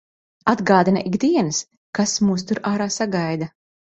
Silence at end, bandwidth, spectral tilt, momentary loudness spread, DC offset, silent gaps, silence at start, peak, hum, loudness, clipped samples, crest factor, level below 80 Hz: 0.5 s; 8.2 kHz; -4.5 dB/octave; 10 LU; under 0.1%; 1.77-1.93 s; 0.45 s; -2 dBFS; none; -20 LUFS; under 0.1%; 18 dB; -58 dBFS